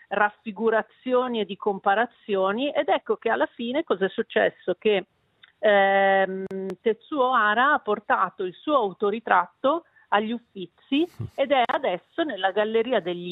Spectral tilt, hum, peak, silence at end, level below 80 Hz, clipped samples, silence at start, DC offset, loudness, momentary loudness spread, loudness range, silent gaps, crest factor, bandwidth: -7 dB/octave; none; -4 dBFS; 0 s; -72 dBFS; under 0.1%; 0.1 s; under 0.1%; -24 LUFS; 9 LU; 3 LU; none; 20 dB; 4.9 kHz